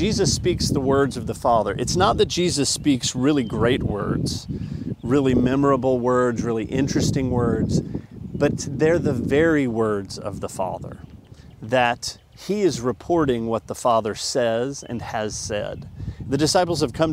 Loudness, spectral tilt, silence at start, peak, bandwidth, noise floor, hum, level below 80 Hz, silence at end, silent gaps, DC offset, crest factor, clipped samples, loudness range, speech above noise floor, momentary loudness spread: -22 LUFS; -5 dB/octave; 0 s; -4 dBFS; 16 kHz; -44 dBFS; none; -42 dBFS; 0 s; none; under 0.1%; 18 dB; under 0.1%; 4 LU; 23 dB; 11 LU